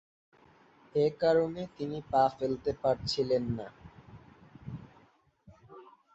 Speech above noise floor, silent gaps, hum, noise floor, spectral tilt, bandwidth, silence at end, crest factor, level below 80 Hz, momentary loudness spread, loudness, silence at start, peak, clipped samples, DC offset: 35 dB; none; none; -65 dBFS; -6.5 dB/octave; 8.2 kHz; 0.3 s; 20 dB; -60 dBFS; 19 LU; -31 LUFS; 0.95 s; -14 dBFS; under 0.1%; under 0.1%